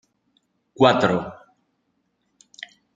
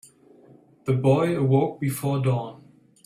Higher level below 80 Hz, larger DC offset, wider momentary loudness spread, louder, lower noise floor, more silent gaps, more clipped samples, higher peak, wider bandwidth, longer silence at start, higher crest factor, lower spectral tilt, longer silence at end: about the same, -62 dBFS vs -60 dBFS; neither; first, 24 LU vs 9 LU; first, -19 LUFS vs -23 LUFS; first, -71 dBFS vs -53 dBFS; neither; neither; first, -2 dBFS vs -8 dBFS; second, 7.8 kHz vs 14.5 kHz; about the same, 0.8 s vs 0.85 s; first, 24 dB vs 18 dB; second, -6 dB/octave vs -7.5 dB/octave; first, 1.6 s vs 0.5 s